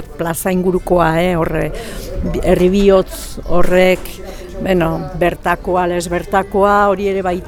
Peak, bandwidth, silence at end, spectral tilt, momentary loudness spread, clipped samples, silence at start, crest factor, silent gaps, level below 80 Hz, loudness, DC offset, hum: 0 dBFS; 19 kHz; 0 s; -6 dB/octave; 12 LU; under 0.1%; 0 s; 14 dB; none; -28 dBFS; -15 LUFS; under 0.1%; none